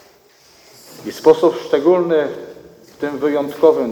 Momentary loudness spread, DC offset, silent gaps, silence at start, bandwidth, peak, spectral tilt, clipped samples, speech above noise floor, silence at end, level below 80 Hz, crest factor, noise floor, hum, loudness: 18 LU; under 0.1%; none; 0.95 s; 19.5 kHz; 0 dBFS; -6 dB/octave; under 0.1%; 35 dB; 0 s; -62 dBFS; 18 dB; -50 dBFS; none; -16 LUFS